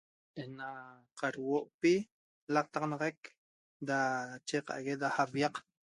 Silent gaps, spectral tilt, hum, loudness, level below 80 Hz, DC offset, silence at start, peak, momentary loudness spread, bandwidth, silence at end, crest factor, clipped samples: 1.74-1.79 s, 2.12-2.47 s, 3.18-3.23 s, 3.37-3.80 s; -5 dB/octave; none; -35 LUFS; -80 dBFS; under 0.1%; 0.35 s; -16 dBFS; 18 LU; 11.5 kHz; 0.3 s; 22 dB; under 0.1%